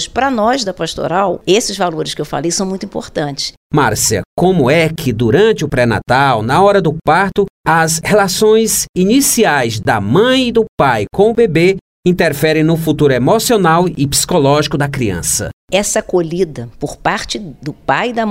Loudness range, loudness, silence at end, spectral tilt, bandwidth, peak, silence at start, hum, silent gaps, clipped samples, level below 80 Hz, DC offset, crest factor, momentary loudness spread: 4 LU; -13 LUFS; 0 s; -4.5 dB/octave; 16.5 kHz; 0 dBFS; 0 s; none; 3.57-3.70 s, 4.25-4.37 s, 7.50-7.64 s, 8.89-8.94 s, 10.69-10.78 s, 11.81-12.03 s, 15.53-15.68 s; under 0.1%; -38 dBFS; under 0.1%; 12 dB; 8 LU